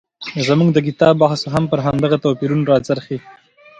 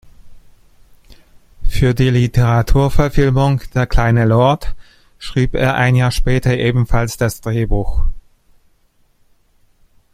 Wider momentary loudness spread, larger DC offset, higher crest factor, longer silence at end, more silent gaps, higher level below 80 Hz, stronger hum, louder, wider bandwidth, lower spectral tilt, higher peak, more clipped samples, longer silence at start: about the same, 9 LU vs 9 LU; neither; about the same, 16 dB vs 14 dB; second, 0.5 s vs 1.95 s; neither; second, -48 dBFS vs -22 dBFS; neither; about the same, -16 LUFS vs -16 LUFS; second, 10.5 kHz vs 15.5 kHz; about the same, -7 dB/octave vs -7 dB/octave; about the same, 0 dBFS vs 0 dBFS; neither; about the same, 0.2 s vs 0.25 s